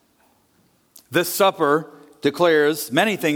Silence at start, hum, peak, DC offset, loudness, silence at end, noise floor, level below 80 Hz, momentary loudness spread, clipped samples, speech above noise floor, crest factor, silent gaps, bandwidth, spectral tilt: 1.1 s; none; -4 dBFS; under 0.1%; -19 LUFS; 0 s; -61 dBFS; -68 dBFS; 8 LU; under 0.1%; 42 dB; 18 dB; none; 19 kHz; -4 dB/octave